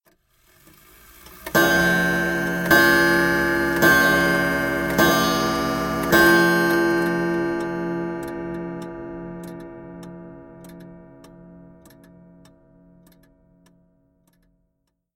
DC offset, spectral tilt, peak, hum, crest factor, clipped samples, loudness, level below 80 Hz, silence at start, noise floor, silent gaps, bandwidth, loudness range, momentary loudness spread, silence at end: under 0.1%; -4.5 dB/octave; -2 dBFS; none; 20 dB; under 0.1%; -19 LUFS; -46 dBFS; 1.3 s; -73 dBFS; none; 17 kHz; 18 LU; 21 LU; 3.55 s